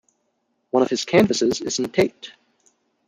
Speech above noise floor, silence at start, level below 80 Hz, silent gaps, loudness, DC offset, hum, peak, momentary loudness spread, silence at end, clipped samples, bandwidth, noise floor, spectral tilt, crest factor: 51 dB; 0.75 s; -60 dBFS; none; -20 LUFS; under 0.1%; none; -4 dBFS; 10 LU; 0.75 s; under 0.1%; 15.5 kHz; -71 dBFS; -4.5 dB/octave; 20 dB